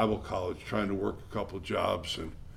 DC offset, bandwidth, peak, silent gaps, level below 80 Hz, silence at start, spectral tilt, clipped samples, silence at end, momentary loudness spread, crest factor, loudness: under 0.1%; 15.5 kHz; -12 dBFS; none; -50 dBFS; 0 s; -5.5 dB/octave; under 0.1%; 0 s; 7 LU; 20 dB; -33 LUFS